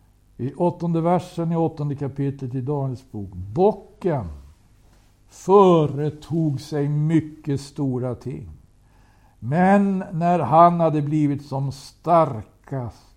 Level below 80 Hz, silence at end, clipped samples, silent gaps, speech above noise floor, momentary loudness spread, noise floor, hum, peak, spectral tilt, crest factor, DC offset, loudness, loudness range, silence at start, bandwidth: -52 dBFS; 0.25 s; under 0.1%; none; 33 dB; 17 LU; -54 dBFS; none; -2 dBFS; -8.5 dB/octave; 20 dB; under 0.1%; -21 LUFS; 6 LU; 0.4 s; 10.5 kHz